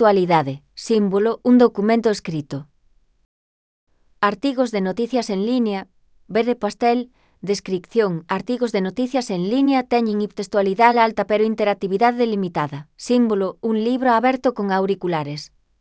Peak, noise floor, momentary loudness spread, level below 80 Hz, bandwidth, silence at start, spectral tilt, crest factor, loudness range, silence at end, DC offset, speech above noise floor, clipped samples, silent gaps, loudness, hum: 0 dBFS; -58 dBFS; 10 LU; -60 dBFS; 8 kHz; 0 s; -6 dB/octave; 20 dB; 5 LU; 0.35 s; under 0.1%; 39 dB; under 0.1%; 3.25-3.87 s; -20 LUFS; none